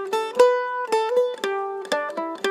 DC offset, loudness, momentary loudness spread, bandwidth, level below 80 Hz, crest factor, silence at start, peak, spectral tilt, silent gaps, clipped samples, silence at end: under 0.1%; -23 LUFS; 8 LU; 14.5 kHz; -78 dBFS; 18 dB; 0 s; -4 dBFS; -2 dB/octave; none; under 0.1%; 0 s